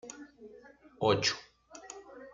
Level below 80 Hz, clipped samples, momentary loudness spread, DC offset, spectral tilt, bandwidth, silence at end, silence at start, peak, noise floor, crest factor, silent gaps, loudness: -68 dBFS; under 0.1%; 25 LU; under 0.1%; -3.5 dB/octave; 9.4 kHz; 0.05 s; 0.05 s; -12 dBFS; -56 dBFS; 24 dB; none; -31 LUFS